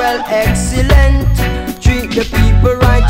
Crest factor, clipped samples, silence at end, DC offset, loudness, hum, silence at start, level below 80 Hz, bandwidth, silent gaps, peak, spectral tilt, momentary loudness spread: 10 dB; 1%; 0 s; under 0.1%; -12 LUFS; none; 0 s; -14 dBFS; 16.5 kHz; none; 0 dBFS; -5.5 dB/octave; 6 LU